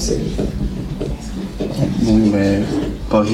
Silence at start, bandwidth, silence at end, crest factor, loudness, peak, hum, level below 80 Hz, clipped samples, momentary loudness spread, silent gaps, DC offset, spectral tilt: 0 s; 14 kHz; 0 s; 16 dB; -19 LUFS; -2 dBFS; none; -28 dBFS; under 0.1%; 11 LU; none; under 0.1%; -6.5 dB/octave